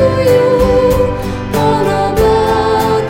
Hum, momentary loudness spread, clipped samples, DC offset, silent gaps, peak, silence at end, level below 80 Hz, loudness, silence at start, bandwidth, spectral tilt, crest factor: none; 5 LU; under 0.1%; under 0.1%; none; 0 dBFS; 0 s; -26 dBFS; -12 LUFS; 0 s; 16.5 kHz; -6.5 dB/octave; 10 dB